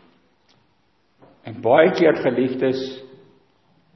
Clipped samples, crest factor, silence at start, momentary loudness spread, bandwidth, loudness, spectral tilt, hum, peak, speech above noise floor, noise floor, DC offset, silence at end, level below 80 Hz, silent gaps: under 0.1%; 22 dB; 1.45 s; 23 LU; 6.2 kHz; -18 LUFS; -7 dB/octave; none; 0 dBFS; 46 dB; -64 dBFS; under 0.1%; 0.9 s; -68 dBFS; none